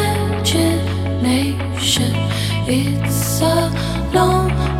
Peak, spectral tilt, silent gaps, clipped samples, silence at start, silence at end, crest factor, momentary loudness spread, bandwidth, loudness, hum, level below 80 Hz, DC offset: -2 dBFS; -5 dB/octave; none; under 0.1%; 0 s; 0 s; 14 dB; 4 LU; 16.5 kHz; -17 LUFS; none; -30 dBFS; under 0.1%